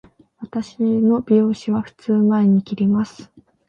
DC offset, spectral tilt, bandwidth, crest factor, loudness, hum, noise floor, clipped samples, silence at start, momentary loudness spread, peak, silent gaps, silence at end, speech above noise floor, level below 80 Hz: under 0.1%; -8.5 dB/octave; 7.2 kHz; 14 dB; -19 LUFS; none; -38 dBFS; under 0.1%; 0.4 s; 13 LU; -4 dBFS; none; 0.45 s; 20 dB; -58 dBFS